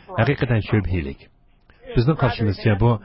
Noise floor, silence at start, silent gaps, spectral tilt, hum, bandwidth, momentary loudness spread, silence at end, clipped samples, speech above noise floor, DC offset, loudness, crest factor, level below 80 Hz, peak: -52 dBFS; 0.1 s; none; -12 dB/octave; none; 5.8 kHz; 8 LU; 0.05 s; under 0.1%; 33 dB; under 0.1%; -21 LUFS; 16 dB; -34 dBFS; -6 dBFS